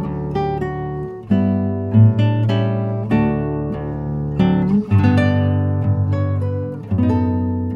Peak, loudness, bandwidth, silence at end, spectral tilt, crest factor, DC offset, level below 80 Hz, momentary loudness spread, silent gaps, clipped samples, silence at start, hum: -2 dBFS; -18 LUFS; 5.2 kHz; 0 s; -10 dB/octave; 16 dB; under 0.1%; -38 dBFS; 10 LU; none; under 0.1%; 0 s; none